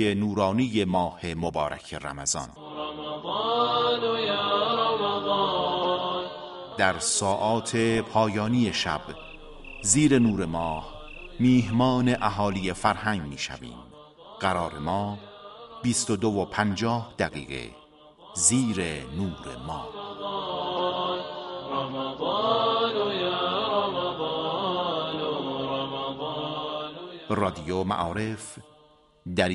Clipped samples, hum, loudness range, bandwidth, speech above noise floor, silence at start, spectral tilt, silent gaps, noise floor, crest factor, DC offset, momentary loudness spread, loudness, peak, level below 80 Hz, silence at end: under 0.1%; none; 5 LU; 11.5 kHz; 32 dB; 0 s; -4 dB/octave; none; -58 dBFS; 22 dB; under 0.1%; 14 LU; -26 LUFS; -6 dBFS; -52 dBFS; 0 s